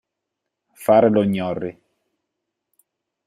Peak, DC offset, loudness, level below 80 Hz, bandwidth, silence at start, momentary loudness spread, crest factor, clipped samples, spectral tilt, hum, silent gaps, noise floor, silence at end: -2 dBFS; under 0.1%; -19 LUFS; -62 dBFS; 15 kHz; 0.8 s; 14 LU; 20 dB; under 0.1%; -7.5 dB/octave; none; none; -81 dBFS; 1.55 s